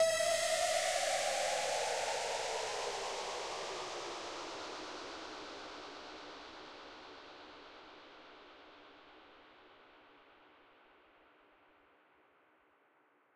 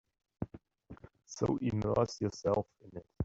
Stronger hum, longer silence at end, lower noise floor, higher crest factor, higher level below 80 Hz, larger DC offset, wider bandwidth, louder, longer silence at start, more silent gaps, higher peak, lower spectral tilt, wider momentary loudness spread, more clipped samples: neither; first, 2.5 s vs 0 s; first, -71 dBFS vs -55 dBFS; about the same, 20 dB vs 20 dB; second, -74 dBFS vs -58 dBFS; neither; first, 16 kHz vs 7.8 kHz; about the same, -37 LUFS vs -35 LUFS; second, 0 s vs 0.4 s; neither; second, -22 dBFS vs -16 dBFS; second, 0 dB/octave vs -7 dB/octave; first, 24 LU vs 21 LU; neither